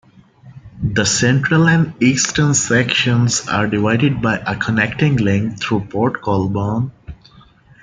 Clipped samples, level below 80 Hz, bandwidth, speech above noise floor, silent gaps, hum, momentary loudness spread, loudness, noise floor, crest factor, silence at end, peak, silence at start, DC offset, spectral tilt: under 0.1%; -44 dBFS; 9.6 kHz; 31 dB; none; none; 6 LU; -16 LUFS; -47 dBFS; 16 dB; 0.7 s; -2 dBFS; 0.45 s; under 0.1%; -4.5 dB/octave